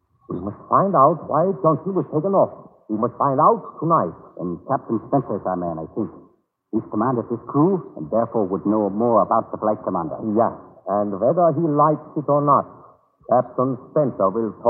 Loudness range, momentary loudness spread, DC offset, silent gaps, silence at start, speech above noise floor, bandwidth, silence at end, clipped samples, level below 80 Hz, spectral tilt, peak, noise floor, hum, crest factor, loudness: 4 LU; 11 LU; under 0.1%; none; 0.3 s; 37 dB; 2.3 kHz; 0 s; under 0.1%; -62 dBFS; -15 dB/octave; -2 dBFS; -56 dBFS; none; 18 dB; -21 LUFS